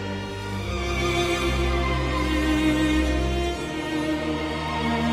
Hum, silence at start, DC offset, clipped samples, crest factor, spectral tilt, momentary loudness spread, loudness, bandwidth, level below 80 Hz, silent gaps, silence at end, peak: none; 0 s; under 0.1%; under 0.1%; 14 dB; -5.5 dB/octave; 7 LU; -25 LUFS; 14.5 kHz; -30 dBFS; none; 0 s; -10 dBFS